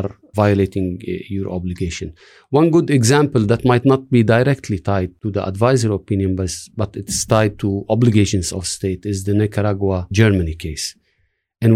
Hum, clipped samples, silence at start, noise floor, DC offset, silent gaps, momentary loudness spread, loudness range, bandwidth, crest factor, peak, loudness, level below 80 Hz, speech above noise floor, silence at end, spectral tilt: none; under 0.1%; 0 s; -66 dBFS; under 0.1%; none; 11 LU; 3 LU; 14.5 kHz; 14 dB; -2 dBFS; -18 LUFS; -40 dBFS; 49 dB; 0 s; -6 dB/octave